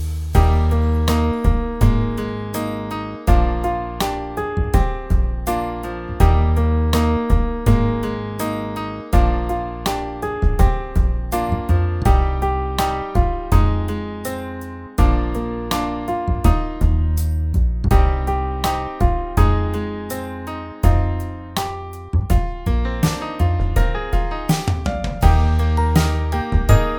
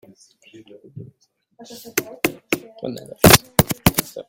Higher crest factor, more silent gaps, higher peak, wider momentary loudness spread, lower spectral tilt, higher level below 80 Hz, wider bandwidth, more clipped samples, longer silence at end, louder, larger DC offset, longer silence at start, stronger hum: about the same, 18 dB vs 22 dB; neither; about the same, 0 dBFS vs 0 dBFS; second, 9 LU vs 20 LU; first, -6.5 dB/octave vs -3.5 dB/octave; first, -20 dBFS vs -42 dBFS; first, over 20 kHz vs 17 kHz; neither; about the same, 0 s vs 0.05 s; second, -20 LUFS vs -17 LUFS; neither; second, 0 s vs 0.95 s; neither